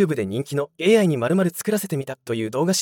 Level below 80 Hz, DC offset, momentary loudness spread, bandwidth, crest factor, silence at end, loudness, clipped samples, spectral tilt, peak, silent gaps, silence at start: -70 dBFS; under 0.1%; 10 LU; 18 kHz; 16 dB; 0 s; -22 LUFS; under 0.1%; -5 dB/octave; -4 dBFS; none; 0 s